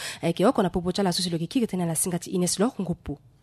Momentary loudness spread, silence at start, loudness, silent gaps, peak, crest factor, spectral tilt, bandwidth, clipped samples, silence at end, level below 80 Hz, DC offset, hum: 9 LU; 0 s; -25 LUFS; none; -10 dBFS; 16 dB; -4.5 dB/octave; 13.5 kHz; under 0.1%; 0.25 s; -50 dBFS; under 0.1%; none